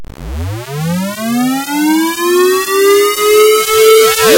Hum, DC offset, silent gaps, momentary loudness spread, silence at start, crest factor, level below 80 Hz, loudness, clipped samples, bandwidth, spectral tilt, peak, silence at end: none; under 0.1%; none; 14 LU; 0 s; 10 dB; -34 dBFS; -10 LUFS; under 0.1%; 17 kHz; -3.5 dB/octave; 0 dBFS; 0 s